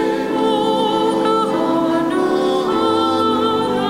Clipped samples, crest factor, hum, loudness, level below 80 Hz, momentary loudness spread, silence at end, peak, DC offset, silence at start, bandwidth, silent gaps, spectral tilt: under 0.1%; 12 dB; none; -17 LUFS; -52 dBFS; 1 LU; 0 s; -4 dBFS; under 0.1%; 0 s; 16 kHz; none; -5.5 dB/octave